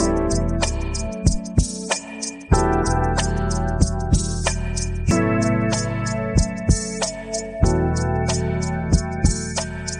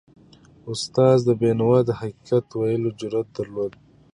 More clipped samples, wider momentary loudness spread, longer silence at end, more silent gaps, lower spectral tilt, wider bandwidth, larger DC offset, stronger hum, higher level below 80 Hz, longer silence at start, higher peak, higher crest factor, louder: neither; second, 6 LU vs 13 LU; second, 0 s vs 0.45 s; neither; second, -5 dB/octave vs -7 dB/octave; about the same, 10.5 kHz vs 10.5 kHz; neither; neither; first, -26 dBFS vs -58 dBFS; second, 0 s vs 0.65 s; about the same, -2 dBFS vs -4 dBFS; about the same, 18 dB vs 18 dB; about the same, -22 LUFS vs -22 LUFS